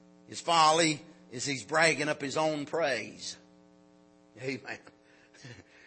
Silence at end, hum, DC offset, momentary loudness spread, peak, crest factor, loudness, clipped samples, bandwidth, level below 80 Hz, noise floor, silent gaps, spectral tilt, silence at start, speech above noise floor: 0.25 s; none; under 0.1%; 22 LU; -10 dBFS; 22 dB; -29 LUFS; under 0.1%; 8.8 kHz; -78 dBFS; -61 dBFS; none; -3 dB/octave; 0.3 s; 31 dB